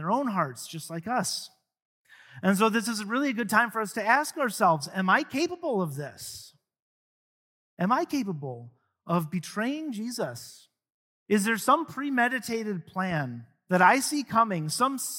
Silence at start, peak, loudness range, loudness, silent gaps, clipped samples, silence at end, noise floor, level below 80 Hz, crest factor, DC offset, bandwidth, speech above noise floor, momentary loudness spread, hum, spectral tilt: 0 s; -6 dBFS; 7 LU; -27 LUFS; 1.85-2.05 s, 6.82-7.77 s, 10.94-11.26 s; under 0.1%; 0 s; under -90 dBFS; -72 dBFS; 22 dB; under 0.1%; 17 kHz; over 63 dB; 13 LU; none; -4.5 dB/octave